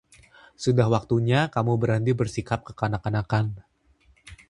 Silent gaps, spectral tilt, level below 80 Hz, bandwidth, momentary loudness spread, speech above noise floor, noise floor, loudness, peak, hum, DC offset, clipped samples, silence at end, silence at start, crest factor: none; -7 dB/octave; -50 dBFS; 11 kHz; 8 LU; 37 dB; -61 dBFS; -25 LUFS; -6 dBFS; none; under 0.1%; under 0.1%; 0.15 s; 0.6 s; 20 dB